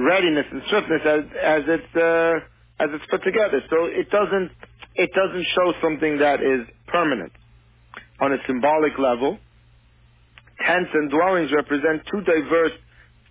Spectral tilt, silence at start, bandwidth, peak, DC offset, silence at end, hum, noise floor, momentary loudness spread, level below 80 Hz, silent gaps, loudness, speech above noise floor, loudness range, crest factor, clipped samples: -9 dB/octave; 0 s; 4 kHz; -6 dBFS; under 0.1%; 0.55 s; none; -54 dBFS; 6 LU; -54 dBFS; none; -21 LUFS; 34 dB; 2 LU; 14 dB; under 0.1%